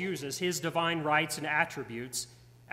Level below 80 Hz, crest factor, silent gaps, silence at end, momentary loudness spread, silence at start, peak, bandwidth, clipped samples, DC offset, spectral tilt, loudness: -68 dBFS; 20 dB; none; 0 s; 9 LU; 0 s; -12 dBFS; 16 kHz; under 0.1%; under 0.1%; -3.5 dB/octave; -31 LUFS